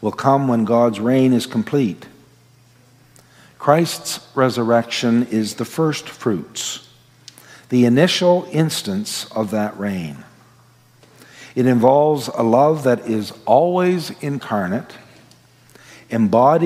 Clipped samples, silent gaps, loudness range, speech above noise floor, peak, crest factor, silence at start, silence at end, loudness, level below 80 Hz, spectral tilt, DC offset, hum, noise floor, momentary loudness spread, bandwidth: under 0.1%; none; 5 LU; 34 dB; 0 dBFS; 18 dB; 0 s; 0 s; -18 LUFS; -66 dBFS; -5.5 dB/octave; under 0.1%; none; -51 dBFS; 11 LU; 16 kHz